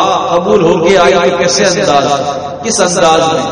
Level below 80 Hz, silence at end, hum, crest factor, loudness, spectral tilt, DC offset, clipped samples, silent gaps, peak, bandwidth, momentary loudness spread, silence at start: -42 dBFS; 0 s; none; 10 dB; -9 LUFS; -3.5 dB/octave; under 0.1%; 0.3%; none; 0 dBFS; 10.5 kHz; 7 LU; 0 s